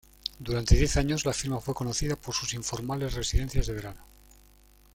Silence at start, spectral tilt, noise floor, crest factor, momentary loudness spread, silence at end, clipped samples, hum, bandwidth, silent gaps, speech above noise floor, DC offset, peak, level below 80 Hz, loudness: 0.25 s; -4.5 dB/octave; -57 dBFS; 24 dB; 11 LU; 0.9 s; under 0.1%; none; 17 kHz; none; 30 dB; under 0.1%; -6 dBFS; -34 dBFS; -29 LUFS